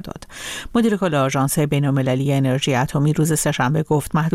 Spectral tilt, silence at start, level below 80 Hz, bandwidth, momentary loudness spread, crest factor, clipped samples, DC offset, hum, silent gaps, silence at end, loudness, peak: -5.5 dB/octave; 0 s; -44 dBFS; 16 kHz; 5 LU; 12 dB; under 0.1%; under 0.1%; none; none; 0 s; -19 LUFS; -6 dBFS